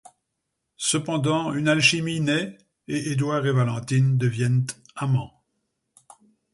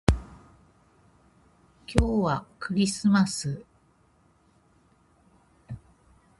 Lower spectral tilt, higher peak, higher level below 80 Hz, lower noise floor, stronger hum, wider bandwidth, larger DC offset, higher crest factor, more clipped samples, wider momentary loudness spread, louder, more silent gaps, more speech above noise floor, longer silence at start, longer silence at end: about the same, -5 dB/octave vs -5.5 dB/octave; second, -4 dBFS vs 0 dBFS; second, -60 dBFS vs -38 dBFS; first, -79 dBFS vs -63 dBFS; neither; about the same, 11.5 kHz vs 11.5 kHz; neither; second, 20 dB vs 28 dB; neither; second, 11 LU vs 22 LU; first, -23 LUFS vs -26 LUFS; neither; first, 57 dB vs 38 dB; first, 0.8 s vs 0.1 s; first, 1.25 s vs 0.6 s